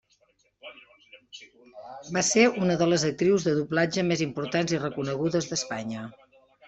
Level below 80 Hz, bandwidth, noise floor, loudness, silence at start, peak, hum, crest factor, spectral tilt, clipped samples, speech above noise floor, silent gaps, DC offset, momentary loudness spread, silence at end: -64 dBFS; 8.2 kHz; -67 dBFS; -25 LUFS; 0.65 s; -6 dBFS; none; 22 dB; -4.5 dB/octave; under 0.1%; 41 dB; none; under 0.1%; 24 LU; 0.55 s